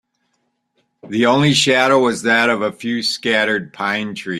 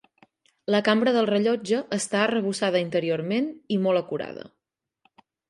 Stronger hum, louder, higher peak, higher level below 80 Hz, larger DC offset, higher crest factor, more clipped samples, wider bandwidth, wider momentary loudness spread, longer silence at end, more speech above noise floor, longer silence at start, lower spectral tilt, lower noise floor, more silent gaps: neither; first, -16 LUFS vs -24 LUFS; first, -2 dBFS vs -6 dBFS; first, -60 dBFS vs -74 dBFS; neither; about the same, 16 dB vs 18 dB; neither; first, 13.5 kHz vs 11.5 kHz; second, 8 LU vs 11 LU; second, 0 s vs 1 s; second, 52 dB vs 60 dB; first, 1.05 s vs 0.7 s; about the same, -4 dB/octave vs -5 dB/octave; second, -69 dBFS vs -84 dBFS; neither